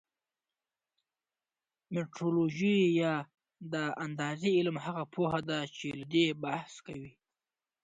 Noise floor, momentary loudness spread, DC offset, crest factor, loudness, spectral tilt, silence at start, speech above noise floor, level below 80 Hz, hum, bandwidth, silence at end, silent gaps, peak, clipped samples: under -90 dBFS; 17 LU; under 0.1%; 18 dB; -32 LUFS; -6 dB/octave; 1.9 s; over 58 dB; -72 dBFS; none; 9.2 kHz; 0.75 s; none; -16 dBFS; under 0.1%